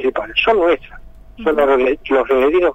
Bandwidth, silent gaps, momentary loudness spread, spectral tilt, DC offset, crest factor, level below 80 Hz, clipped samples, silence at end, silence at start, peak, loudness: 8 kHz; none; 6 LU; -5.5 dB/octave; under 0.1%; 12 dB; -40 dBFS; under 0.1%; 0 s; 0 s; -2 dBFS; -15 LUFS